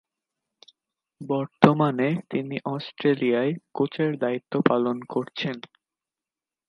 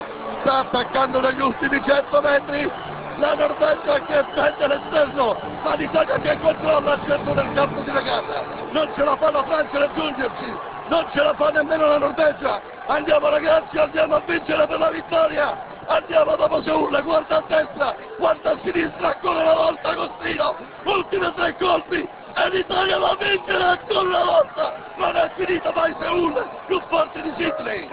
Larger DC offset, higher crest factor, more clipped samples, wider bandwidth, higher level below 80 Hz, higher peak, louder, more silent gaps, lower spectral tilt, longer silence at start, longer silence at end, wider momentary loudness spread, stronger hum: neither; first, 26 dB vs 16 dB; neither; first, 10 kHz vs 4 kHz; second, -72 dBFS vs -50 dBFS; first, 0 dBFS vs -4 dBFS; second, -25 LUFS vs -21 LUFS; neither; about the same, -8 dB/octave vs -8.5 dB/octave; first, 1.2 s vs 0 s; first, 1.1 s vs 0 s; first, 11 LU vs 7 LU; neither